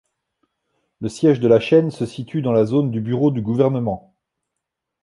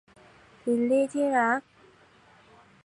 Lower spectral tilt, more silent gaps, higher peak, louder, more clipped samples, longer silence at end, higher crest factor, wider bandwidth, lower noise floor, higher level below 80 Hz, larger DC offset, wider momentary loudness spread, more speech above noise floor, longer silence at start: first, -8 dB/octave vs -5.5 dB/octave; neither; first, -2 dBFS vs -12 dBFS; first, -18 LUFS vs -26 LUFS; neither; second, 1.05 s vs 1.25 s; about the same, 18 dB vs 18 dB; about the same, 11.5 kHz vs 11.5 kHz; first, -81 dBFS vs -58 dBFS; first, -56 dBFS vs -74 dBFS; neither; first, 13 LU vs 7 LU; first, 63 dB vs 33 dB; first, 1 s vs 0.65 s